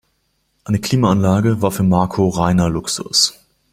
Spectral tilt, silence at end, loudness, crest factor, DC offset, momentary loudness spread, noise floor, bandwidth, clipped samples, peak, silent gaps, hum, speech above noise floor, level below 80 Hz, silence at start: -5 dB/octave; 0.4 s; -16 LUFS; 16 dB; under 0.1%; 5 LU; -65 dBFS; 16 kHz; under 0.1%; 0 dBFS; none; none; 50 dB; -42 dBFS; 0.65 s